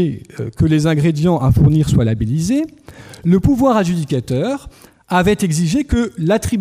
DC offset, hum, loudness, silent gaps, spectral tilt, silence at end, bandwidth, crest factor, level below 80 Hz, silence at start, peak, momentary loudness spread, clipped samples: under 0.1%; none; -16 LUFS; none; -7 dB/octave; 0 s; 15.5 kHz; 12 dB; -32 dBFS; 0 s; -4 dBFS; 8 LU; under 0.1%